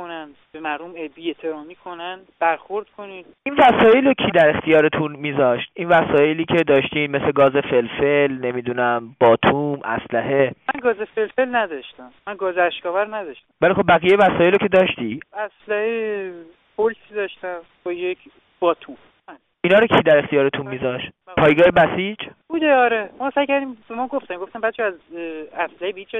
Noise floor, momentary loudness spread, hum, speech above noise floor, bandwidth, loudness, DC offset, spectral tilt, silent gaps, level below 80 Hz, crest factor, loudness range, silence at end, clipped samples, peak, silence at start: -46 dBFS; 17 LU; none; 27 dB; 4 kHz; -19 LUFS; under 0.1%; -7.5 dB/octave; none; -54 dBFS; 16 dB; 9 LU; 0 s; under 0.1%; -4 dBFS; 0 s